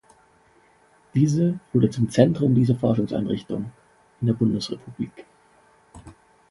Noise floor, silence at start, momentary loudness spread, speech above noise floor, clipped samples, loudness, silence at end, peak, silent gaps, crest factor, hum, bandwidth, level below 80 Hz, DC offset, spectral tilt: -58 dBFS; 1.15 s; 13 LU; 37 dB; under 0.1%; -23 LUFS; 0.4 s; -2 dBFS; none; 22 dB; none; 11.5 kHz; -54 dBFS; under 0.1%; -8 dB/octave